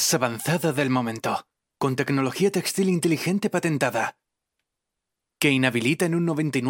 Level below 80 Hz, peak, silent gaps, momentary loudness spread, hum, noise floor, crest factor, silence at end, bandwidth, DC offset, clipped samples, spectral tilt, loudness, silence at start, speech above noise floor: -66 dBFS; -2 dBFS; none; 7 LU; none; -84 dBFS; 22 dB; 0 s; 17 kHz; under 0.1%; under 0.1%; -4.5 dB/octave; -24 LUFS; 0 s; 60 dB